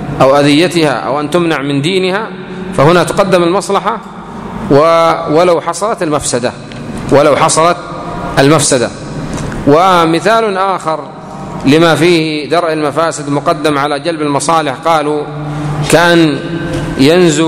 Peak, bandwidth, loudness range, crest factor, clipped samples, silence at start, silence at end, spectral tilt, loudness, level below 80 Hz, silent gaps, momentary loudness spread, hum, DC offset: 0 dBFS; 15.5 kHz; 2 LU; 10 dB; 0.6%; 0 s; 0 s; -5 dB/octave; -10 LUFS; -36 dBFS; none; 13 LU; none; under 0.1%